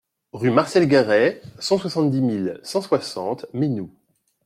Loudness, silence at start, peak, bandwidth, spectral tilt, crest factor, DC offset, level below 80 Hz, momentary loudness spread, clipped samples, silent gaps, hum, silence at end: -21 LUFS; 0.35 s; -4 dBFS; 14 kHz; -6 dB/octave; 18 dB; under 0.1%; -62 dBFS; 12 LU; under 0.1%; none; none; 0.6 s